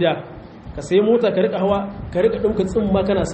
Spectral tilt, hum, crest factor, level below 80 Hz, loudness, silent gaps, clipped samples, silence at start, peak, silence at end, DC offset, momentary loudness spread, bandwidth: -6.5 dB/octave; none; 16 dB; -40 dBFS; -19 LUFS; none; under 0.1%; 0 s; -4 dBFS; 0 s; under 0.1%; 17 LU; 8.6 kHz